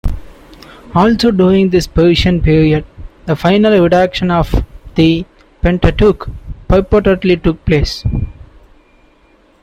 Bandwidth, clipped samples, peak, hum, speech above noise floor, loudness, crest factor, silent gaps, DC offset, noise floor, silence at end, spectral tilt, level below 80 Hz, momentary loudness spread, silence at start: 14.5 kHz; under 0.1%; 0 dBFS; none; 38 dB; -12 LUFS; 12 dB; none; under 0.1%; -49 dBFS; 1.3 s; -7 dB/octave; -24 dBFS; 12 LU; 0.05 s